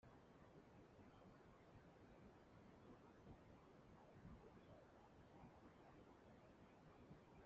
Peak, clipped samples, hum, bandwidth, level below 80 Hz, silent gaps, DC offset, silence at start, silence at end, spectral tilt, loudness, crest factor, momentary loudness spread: -50 dBFS; under 0.1%; none; 7.2 kHz; -78 dBFS; none; under 0.1%; 0 s; 0 s; -6 dB/octave; -68 LUFS; 16 dB; 3 LU